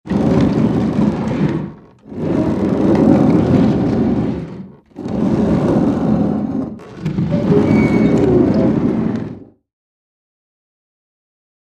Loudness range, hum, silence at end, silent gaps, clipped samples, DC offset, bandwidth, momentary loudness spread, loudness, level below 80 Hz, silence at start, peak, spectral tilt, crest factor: 3 LU; none; 2.3 s; none; under 0.1%; under 0.1%; 8.6 kHz; 14 LU; -15 LUFS; -36 dBFS; 0.05 s; 0 dBFS; -9 dB/octave; 16 dB